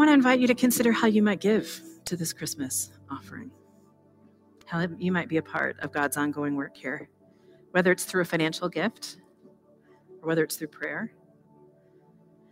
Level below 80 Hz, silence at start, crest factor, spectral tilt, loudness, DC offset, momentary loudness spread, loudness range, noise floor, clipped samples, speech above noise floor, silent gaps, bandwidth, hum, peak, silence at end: -68 dBFS; 0 s; 22 dB; -4.5 dB/octave; -27 LUFS; under 0.1%; 17 LU; 8 LU; -59 dBFS; under 0.1%; 33 dB; none; 16 kHz; none; -6 dBFS; 1.45 s